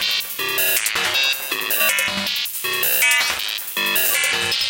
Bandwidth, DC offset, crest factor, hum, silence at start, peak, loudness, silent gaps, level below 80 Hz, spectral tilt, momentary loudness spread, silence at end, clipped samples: 18 kHz; under 0.1%; 16 dB; none; 0 s; -4 dBFS; -17 LUFS; none; -60 dBFS; 0.5 dB/octave; 6 LU; 0 s; under 0.1%